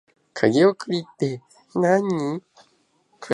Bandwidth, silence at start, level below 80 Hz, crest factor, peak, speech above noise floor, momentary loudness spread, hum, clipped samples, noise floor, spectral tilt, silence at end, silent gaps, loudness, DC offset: 11 kHz; 0.35 s; -68 dBFS; 20 dB; -4 dBFS; 42 dB; 18 LU; none; under 0.1%; -64 dBFS; -6.5 dB/octave; 0 s; none; -22 LUFS; under 0.1%